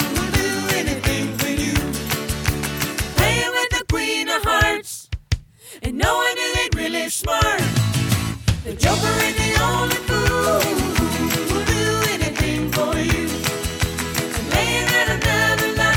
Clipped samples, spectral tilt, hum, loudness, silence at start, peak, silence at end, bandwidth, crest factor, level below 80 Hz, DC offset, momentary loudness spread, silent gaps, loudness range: under 0.1%; -4 dB/octave; none; -20 LUFS; 0 s; -4 dBFS; 0 s; over 20 kHz; 16 dB; -32 dBFS; under 0.1%; 6 LU; none; 2 LU